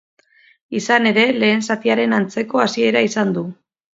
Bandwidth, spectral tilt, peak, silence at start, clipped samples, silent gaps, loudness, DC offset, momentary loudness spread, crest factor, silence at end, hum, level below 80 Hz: 7.8 kHz; -4.5 dB/octave; 0 dBFS; 0.7 s; under 0.1%; none; -17 LUFS; under 0.1%; 11 LU; 18 dB; 0.45 s; none; -66 dBFS